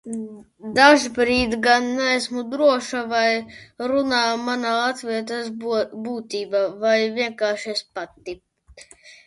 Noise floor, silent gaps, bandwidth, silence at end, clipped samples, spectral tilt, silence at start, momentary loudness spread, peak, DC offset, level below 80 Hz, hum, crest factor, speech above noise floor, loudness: -48 dBFS; none; 11.5 kHz; 0.1 s; under 0.1%; -3 dB/octave; 0.05 s; 15 LU; -2 dBFS; under 0.1%; -52 dBFS; none; 20 dB; 27 dB; -21 LUFS